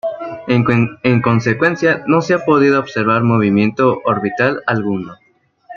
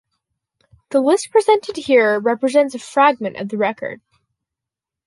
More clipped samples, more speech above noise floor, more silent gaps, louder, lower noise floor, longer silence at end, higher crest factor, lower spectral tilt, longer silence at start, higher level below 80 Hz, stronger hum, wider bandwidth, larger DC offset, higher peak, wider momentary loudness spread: neither; second, 27 dB vs 69 dB; neither; about the same, -15 LUFS vs -17 LUFS; second, -41 dBFS vs -86 dBFS; second, 0 s vs 1.1 s; about the same, 14 dB vs 16 dB; first, -7.5 dB/octave vs -4 dB/octave; second, 0.05 s vs 0.9 s; first, -54 dBFS vs -66 dBFS; neither; second, 7.2 kHz vs 11.5 kHz; neither; about the same, -2 dBFS vs -2 dBFS; second, 6 LU vs 9 LU